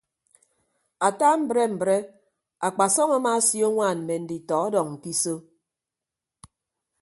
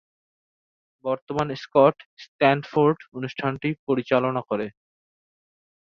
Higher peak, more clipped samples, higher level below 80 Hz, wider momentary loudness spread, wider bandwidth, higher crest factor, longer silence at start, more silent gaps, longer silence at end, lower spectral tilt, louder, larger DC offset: about the same, -6 dBFS vs -4 dBFS; neither; second, -72 dBFS vs -64 dBFS; second, 9 LU vs 12 LU; first, 12 kHz vs 7 kHz; about the same, 20 dB vs 22 dB; about the same, 1 s vs 1.05 s; second, none vs 1.22-1.27 s, 2.06-2.17 s, 2.28-2.39 s, 3.79-3.87 s; first, 1.6 s vs 1.25 s; second, -3.5 dB/octave vs -7.5 dB/octave; about the same, -23 LUFS vs -23 LUFS; neither